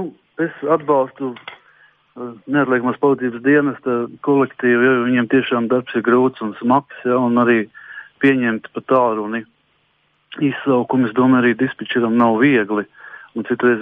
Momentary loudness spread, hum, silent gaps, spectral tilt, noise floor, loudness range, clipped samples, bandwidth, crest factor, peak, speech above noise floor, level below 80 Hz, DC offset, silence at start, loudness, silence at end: 15 LU; none; none; -9 dB/octave; -62 dBFS; 3 LU; under 0.1%; 3.8 kHz; 16 dB; -2 dBFS; 46 dB; -66 dBFS; under 0.1%; 0 s; -17 LUFS; 0 s